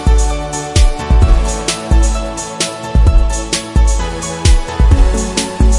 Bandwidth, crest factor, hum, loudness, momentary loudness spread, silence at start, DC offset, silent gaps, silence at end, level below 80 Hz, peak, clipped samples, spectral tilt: 11.5 kHz; 12 dB; none; -14 LUFS; 6 LU; 0 s; under 0.1%; none; 0 s; -12 dBFS; 0 dBFS; under 0.1%; -4.5 dB/octave